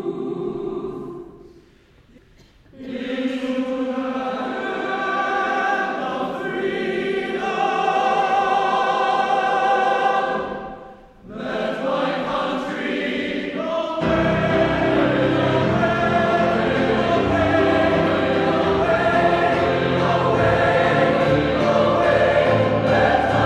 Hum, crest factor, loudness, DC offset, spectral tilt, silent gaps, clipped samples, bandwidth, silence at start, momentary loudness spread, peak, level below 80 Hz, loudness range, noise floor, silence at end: none; 16 dB; -20 LUFS; under 0.1%; -6.5 dB/octave; none; under 0.1%; 10.5 kHz; 0 s; 10 LU; -4 dBFS; -44 dBFS; 8 LU; -52 dBFS; 0 s